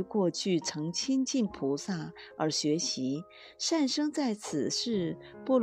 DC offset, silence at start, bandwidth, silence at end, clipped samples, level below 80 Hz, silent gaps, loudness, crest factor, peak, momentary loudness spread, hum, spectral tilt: under 0.1%; 0 s; 12.5 kHz; 0 s; under 0.1%; -70 dBFS; none; -31 LUFS; 16 dB; -16 dBFS; 8 LU; none; -4 dB/octave